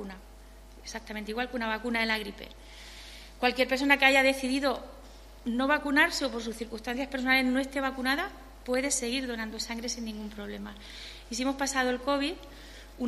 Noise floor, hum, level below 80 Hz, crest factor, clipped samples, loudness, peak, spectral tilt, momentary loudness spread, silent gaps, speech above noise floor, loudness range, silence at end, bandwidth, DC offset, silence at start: -50 dBFS; none; -50 dBFS; 24 dB; under 0.1%; -28 LUFS; -6 dBFS; -2.5 dB/octave; 21 LU; none; 20 dB; 7 LU; 0 s; 13.5 kHz; under 0.1%; 0 s